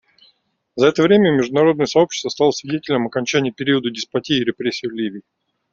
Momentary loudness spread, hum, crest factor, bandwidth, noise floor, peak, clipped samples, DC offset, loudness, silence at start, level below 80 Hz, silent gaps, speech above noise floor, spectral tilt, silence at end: 11 LU; none; 16 dB; 7.6 kHz; -61 dBFS; -2 dBFS; under 0.1%; under 0.1%; -18 LUFS; 0.75 s; -60 dBFS; none; 43 dB; -5 dB/octave; 0.55 s